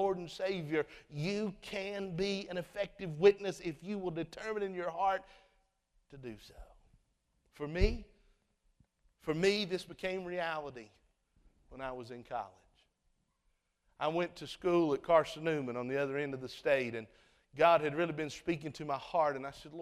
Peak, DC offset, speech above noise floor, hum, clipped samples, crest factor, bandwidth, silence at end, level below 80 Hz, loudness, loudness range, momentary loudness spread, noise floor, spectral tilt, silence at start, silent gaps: -14 dBFS; under 0.1%; 44 dB; none; under 0.1%; 22 dB; 13.5 kHz; 0 s; -52 dBFS; -35 LUFS; 9 LU; 16 LU; -78 dBFS; -5.5 dB/octave; 0 s; none